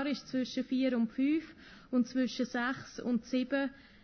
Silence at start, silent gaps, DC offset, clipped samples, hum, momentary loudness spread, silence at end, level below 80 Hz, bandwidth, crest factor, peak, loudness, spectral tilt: 0 s; none; under 0.1%; under 0.1%; none; 6 LU; 0.25 s; -68 dBFS; 6.6 kHz; 14 dB; -20 dBFS; -34 LUFS; -5 dB/octave